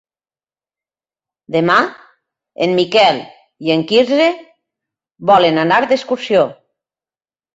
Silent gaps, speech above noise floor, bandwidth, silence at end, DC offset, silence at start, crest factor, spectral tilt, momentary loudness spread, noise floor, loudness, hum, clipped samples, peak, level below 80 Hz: none; over 77 dB; 8 kHz; 1.05 s; under 0.1%; 1.5 s; 16 dB; -5.5 dB/octave; 10 LU; under -90 dBFS; -14 LUFS; none; under 0.1%; 0 dBFS; -60 dBFS